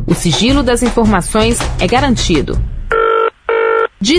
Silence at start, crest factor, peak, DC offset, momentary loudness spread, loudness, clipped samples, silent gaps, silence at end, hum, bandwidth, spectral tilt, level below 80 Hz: 0 s; 12 dB; 0 dBFS; under 0.1%; 4 LU; -13 LUFS; under 0.1%; none; 0 s; none; 11 kHz; -4.5 dB/octave; -22 dBFS